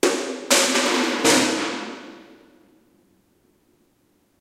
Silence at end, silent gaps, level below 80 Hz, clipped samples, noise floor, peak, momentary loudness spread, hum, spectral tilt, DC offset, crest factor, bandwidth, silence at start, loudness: 2.15 s; none; -68 dBFS; under 0.1%; -64 dBFS; -4 dBFS; 18 LU; none; -1 dB/octave; under 0.1%; 20 dB; 16 kHz; 0.05 s; -19 LUFS